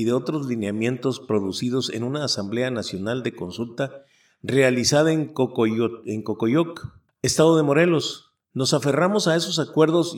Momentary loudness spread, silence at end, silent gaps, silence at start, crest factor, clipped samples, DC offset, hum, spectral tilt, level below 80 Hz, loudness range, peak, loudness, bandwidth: 12 LU; 0 s; none; 0 s; 18 dB; under 0.1%; under 0.1%; none; -5 dB/octave; -60 dBFS; 5 LU; -4 dBFS; -22 LUFS; 17 kHz